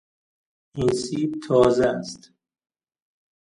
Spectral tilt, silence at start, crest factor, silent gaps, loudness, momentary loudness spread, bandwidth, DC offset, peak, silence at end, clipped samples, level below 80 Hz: -6 dB/octave; 0.75 s; 20 dB; none; -22 LUFS; 19 LU; 11 kHz; under 0.1%; -4 dBFS; 1.35 s; under 0.1%; -54 dBFS